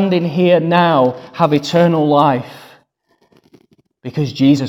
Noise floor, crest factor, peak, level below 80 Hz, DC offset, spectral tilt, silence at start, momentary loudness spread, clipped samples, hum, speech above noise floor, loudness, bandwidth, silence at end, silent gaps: -60 dBFS; 14 dB; 0 dBFS; -58 dBFS; under 0.1%; -7 dB/octave; 0 s; 10 LU; under 0.1%; none; 46 dB; -14 LUFS; 12.5 kHz; 0 s; none